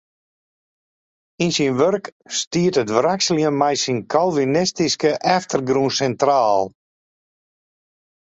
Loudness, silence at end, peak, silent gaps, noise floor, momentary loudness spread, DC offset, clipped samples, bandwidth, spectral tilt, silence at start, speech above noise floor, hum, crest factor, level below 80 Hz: -19 LUFS; 1.6 s; -2 dBFS; 2.12-2.20 s, 2.47-2.51 s; under -90 dBFS; 5 LU; under 0.1%; under 0.1%; 8.2 kHz; -4 dB/octave; 1.4 s; over 71 dB; none; 18 dB; -60 dBFS